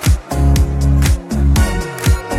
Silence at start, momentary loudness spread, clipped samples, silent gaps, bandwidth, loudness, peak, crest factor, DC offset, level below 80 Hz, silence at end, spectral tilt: 0 s; 3 LU; under 0.1%; none; 15.5 kHz; -15 LUFS; 0 dBFS; 12 dB; under 0.1%; -16 dBFS; 0 s; -5.5 dB/octave